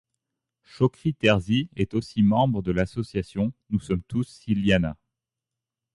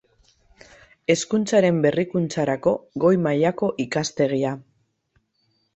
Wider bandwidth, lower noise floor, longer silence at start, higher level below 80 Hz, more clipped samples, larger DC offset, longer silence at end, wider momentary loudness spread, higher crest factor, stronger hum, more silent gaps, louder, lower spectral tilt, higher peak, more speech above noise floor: first, 11.5 kHz vs 8.2 kHz; first, -88 dBFS vs -69 dBFS; second, 0.75 s vs 1.1 s; first, -46 dBFS vs -60 dBFS; neither; neither; about the same, 1.05 s vs 1.15 s; about the same, 9 LU vs 7 LU; about the same, 18 dB vs 18 dB; neither; neither; second, -25 LUFS vs -22 LUFS; first, -7 dB/octave vs -5.5 dB/octave; about the same, -6 dBFS vs -4 dBFS; first, 64 dB vs 48 dB